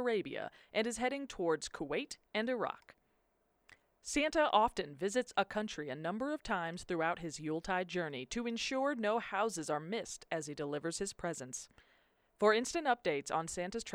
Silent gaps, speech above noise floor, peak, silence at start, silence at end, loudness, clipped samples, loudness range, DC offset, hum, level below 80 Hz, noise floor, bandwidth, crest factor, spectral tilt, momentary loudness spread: none; 41 dB; -14 dBFS; 0 s; 0 s; -37 LUFS; under 0.1%; 3 LU; under 0.1%; none; -64 dBFS; -77 dBFS; 15.5 kHz; 24 dB; -3.5 dB/octave; 10 LU